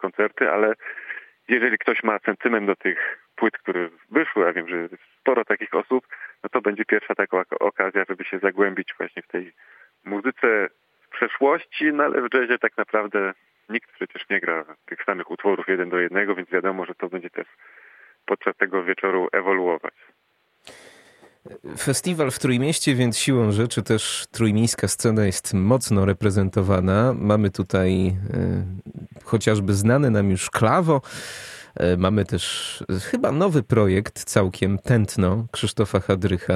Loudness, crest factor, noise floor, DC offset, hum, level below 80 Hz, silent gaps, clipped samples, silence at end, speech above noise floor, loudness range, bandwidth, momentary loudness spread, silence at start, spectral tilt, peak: -22 LUFS; 22 dB; -53 dBFS; under 0.1%; none; -52 dBFS; none; under 0.1%; 0 s; 31 dB; 5 LU; 14.5 kHz; 12 LU; 0 s; -5.5 dB/octave; -2 dBFS